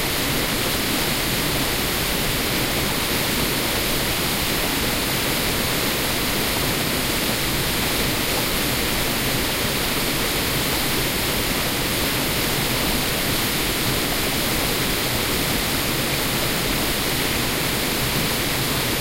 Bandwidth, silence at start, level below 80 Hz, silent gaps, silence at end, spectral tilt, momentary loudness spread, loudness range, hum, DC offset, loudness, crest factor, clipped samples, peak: 16 kHz; 0 s; -34 dBFS; none; 0 s; -3 dB/octave; 1 LU; 0 LU; none; under 0.1%; -20 LUFS; 14 dB; under 0.1%; -8 dBFS